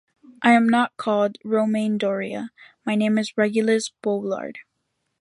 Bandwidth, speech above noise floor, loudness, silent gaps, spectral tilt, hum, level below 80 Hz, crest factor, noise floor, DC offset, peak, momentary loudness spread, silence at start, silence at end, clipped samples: 11.5 kHz; 54 dB; -22 LUFS; none; -5.5 dB/octave; none; -70 dBFS; 20 dB; -75 dBFS; under 0.1%; -4 dBFS; 13 LU; 0.3 s; 0.6 s; under 0.1%